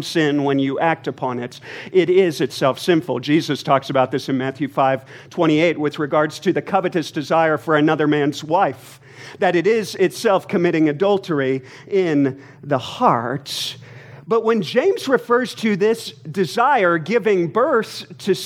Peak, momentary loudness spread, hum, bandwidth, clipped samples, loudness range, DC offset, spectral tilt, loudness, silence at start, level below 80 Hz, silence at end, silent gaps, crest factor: -2 dBFS; 9 LU; none; 16 kHz; under 0.1%; 2 LU; under 0.1%; -5.5 dB/octave; -19 LUFS; 0 s; -70 dBFS; 0 s; none; 18 dB